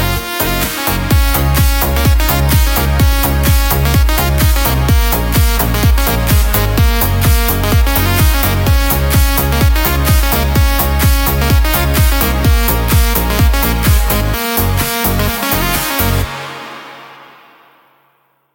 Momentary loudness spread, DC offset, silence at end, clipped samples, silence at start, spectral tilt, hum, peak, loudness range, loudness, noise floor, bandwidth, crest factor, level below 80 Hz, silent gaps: 3 LU; under 0.1%; 1.3 s; under 0.1%; 0 s; -4.5 dB/octave; none; 0 dBFS; 3 LU; -12 LUFS; -57 dBFS; 17 kHz; 12 dB; -14 dBFS; none